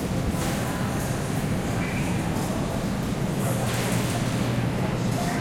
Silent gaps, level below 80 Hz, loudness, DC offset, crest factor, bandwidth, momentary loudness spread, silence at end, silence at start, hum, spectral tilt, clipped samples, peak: none; -40 dBFS; -26 LUFS; under 0.1%; 12 dB; 16.5 kHz; 2 LU; 0 s; 0 s; none; -5.5 dB/octave; under 0.1%; -12 dBFS